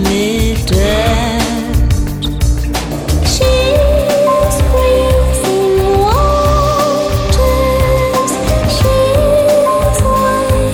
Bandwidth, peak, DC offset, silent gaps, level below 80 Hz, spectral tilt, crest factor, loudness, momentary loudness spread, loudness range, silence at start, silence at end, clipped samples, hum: 20 kHz; 0 dBFS; under 0.1%; none; -16 dBFS; -5.5 dB/octave; 10 dB; -12 LUFS; 4 LU; 2 LU; 0 s; 0 s; under 0.1%; none